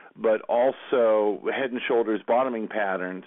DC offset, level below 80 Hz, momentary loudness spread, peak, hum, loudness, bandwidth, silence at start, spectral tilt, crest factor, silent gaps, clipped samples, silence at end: under 0.1%; -76 dBFS; 6 LU; -12 dBFS; none; -25 LUFS; 3.9 kHz; 0.15 s; -9.5 dB/octave; 14 dB; none; under 0.1%; 0 s